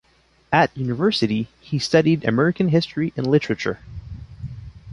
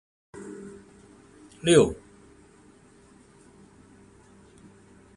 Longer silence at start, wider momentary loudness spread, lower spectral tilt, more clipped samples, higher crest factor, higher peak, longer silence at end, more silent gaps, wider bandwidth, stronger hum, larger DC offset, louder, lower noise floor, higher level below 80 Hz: first, 0.5 s vs 0.35 s; second, 18 LU vs 28 LU; first, -6.5 dB/octave vs -5 dB/octave; neither; second, 20 dB vs 26 dB; about the same, -2 dBFS vs -4 dBFS; second, 0 s vs 3.25 s; neither; about the same, 11.5 kHz vs 11.5 kHz; neither; neither; about the same, -20 LUFS vs -22 LUFS; first, -59 dBFS vs -55 dBFS; first, -46 dBFS vs -56 dBFS